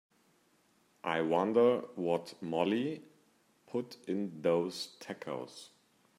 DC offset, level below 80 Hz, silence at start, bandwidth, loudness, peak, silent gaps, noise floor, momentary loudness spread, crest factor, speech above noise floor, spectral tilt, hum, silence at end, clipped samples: under 0.1%; -84 dBFS; 1.05 s; 13.5 kHz; -34 LUFS; -14 dBFS; none; -71 dBFS; 14 LU; 20 dB; 37 dB; -6 dB/octave; none; 0.5 s; under 0.1%